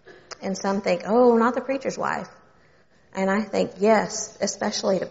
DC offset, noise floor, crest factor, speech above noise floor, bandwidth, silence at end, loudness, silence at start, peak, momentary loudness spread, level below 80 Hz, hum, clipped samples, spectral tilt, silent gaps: under 0.1%; -59 dBFS; 18 dB; 36 dB; 8 kHz; 0 s; -23 LUFS; 0.05 s; -6 dBFS; 13 LU; -62 dBFS; none; under 0.1%; -4 dB/octave; none